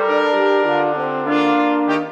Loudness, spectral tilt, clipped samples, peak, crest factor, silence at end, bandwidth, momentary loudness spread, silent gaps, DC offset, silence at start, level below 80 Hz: -17 LUFS; -6 dB/octave; under 0.1%; -4 dBFS; 12 dB; 0 s; 8 kHz; 4 LU; none; under 0.1%; 0 s; -72 dBFS